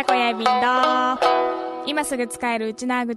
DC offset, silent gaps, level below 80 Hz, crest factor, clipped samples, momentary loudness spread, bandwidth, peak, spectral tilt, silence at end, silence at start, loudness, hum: under 0.1%; none; -60 dBFS; 16 dB; under 0.1%; 7 LU; 12.5 kHz; -6 dBFS; -2.5 dB/octave; 0 s; 0 s; -21 LUFS; none